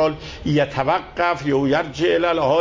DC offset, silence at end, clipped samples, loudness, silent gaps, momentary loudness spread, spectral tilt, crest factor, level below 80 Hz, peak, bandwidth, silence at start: under 0.1%; 0 s; under 0.1%; -20 LUFS; none; 4 LU; -6.5 dB/octave; 14 dB; -44 dBFS; -6 dBFS; 7.6 kHz; 0 s